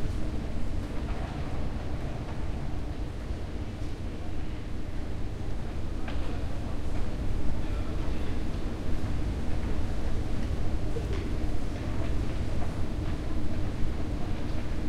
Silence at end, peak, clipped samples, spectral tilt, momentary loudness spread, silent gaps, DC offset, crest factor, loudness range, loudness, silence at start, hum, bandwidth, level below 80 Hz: 0 s; -14 dBFS; under 0.1%; -7 dB/octave; 4 LU; none; under 0.1%; 14 dB; 3 LU; -35 LUFS; 0 s; none; 9.4 kHz; -32 dBFS